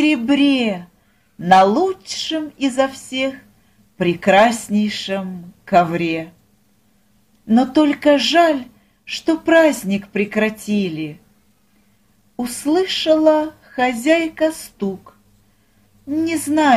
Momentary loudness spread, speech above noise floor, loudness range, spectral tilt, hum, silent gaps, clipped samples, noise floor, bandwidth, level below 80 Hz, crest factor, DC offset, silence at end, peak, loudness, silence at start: 13 LU; 42 dB; 4 LU; -4.5 dB/octave; none; none; under 0.1%; -59 dBFS; 15.5 kHz; -56 dBFS; 18 dB; under 0.1%; 0 s; 0 dBFS; -17 LUFS; 0 s